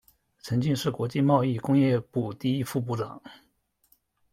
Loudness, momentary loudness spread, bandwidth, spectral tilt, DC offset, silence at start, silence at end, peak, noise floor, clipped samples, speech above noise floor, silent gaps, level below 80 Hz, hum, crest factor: -27 LUFS; 10 LU; 16.5 kHz; -7 dB/octave; under 0.1%; 0.45 s; 0.95 s; -8 dBFS; -67 dBFS; under 0.1%; 41 dB; none; -62 dBFS; none; 20 dB